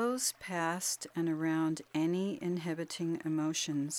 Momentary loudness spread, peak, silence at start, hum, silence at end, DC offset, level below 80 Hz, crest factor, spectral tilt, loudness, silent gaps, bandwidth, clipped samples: 4 LU; -20 dBFS; 0 s; none; 0 s; under 0.1%; -78 dBFS; 14 dB; -4 dB/octave; -34 LUFS; none; 17 kHz; under 0.1%